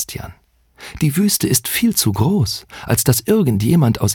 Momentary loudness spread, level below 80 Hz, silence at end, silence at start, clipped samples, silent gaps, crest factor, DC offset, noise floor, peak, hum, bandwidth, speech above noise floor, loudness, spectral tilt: 12 LU; -42 dBFS; 0 s; 0 s; under 0.1%; none; 16 dB; under 0.1%; -40 dBFS; 0 dBFS; none; over 20 kHz; 24 dB; -16 LUFS; -5 dB/octave